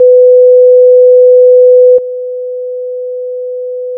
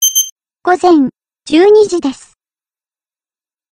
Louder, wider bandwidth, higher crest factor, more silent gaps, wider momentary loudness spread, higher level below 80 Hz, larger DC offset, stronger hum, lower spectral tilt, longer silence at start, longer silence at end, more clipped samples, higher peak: first, -4 LUFS vs -11 LUFS; second, 0.6 kHz vs 16 kHz; second, 6 dB vs 12 dB; second, none vs 0.32-0.36 s; first, 15 LU vs 12 LU; second, -70 dBFS vs -54 dBFS; neither; first, 50 Hz at -80 dBFS vs none; first, -11 dB/octave vs -2 dB/octave; about the same, 0 s vs 0 s; second, 0 s vs 1.6 s; neither; about the same, 0 dBFS vs 0 dBFS